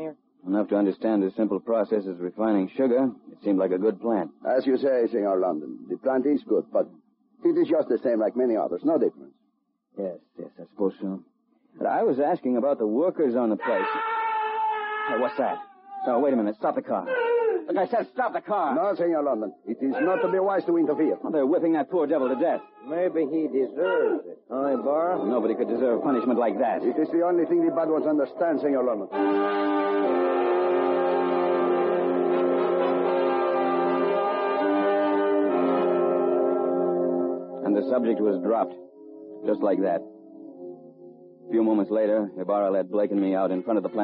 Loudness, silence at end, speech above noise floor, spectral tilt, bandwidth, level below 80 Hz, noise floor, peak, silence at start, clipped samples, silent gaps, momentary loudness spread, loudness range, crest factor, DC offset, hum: -25 LUFS; 0 s; 48 dB; -5.5 dB/octave; 5.2 kHz; -76 dBFS; -72 dBFS; -12 dBFS; 0 s; under 0.1%; none; 7 LU; 4 LU; 14 dB; under 0.1%; none